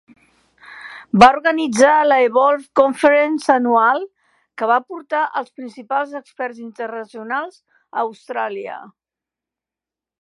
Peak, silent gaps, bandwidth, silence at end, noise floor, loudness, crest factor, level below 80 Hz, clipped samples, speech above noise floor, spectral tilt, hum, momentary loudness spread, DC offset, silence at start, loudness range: 0 dBFS; none; 11.5 kHz; 1.35 s; -88 dBFS; -17 LUFS; 18 dB; -56 dBFS; under 0.1%; 72 dB; -4.5 dB/octave; none; 20 LU; under 0.1%; 0.7 s; 13 LU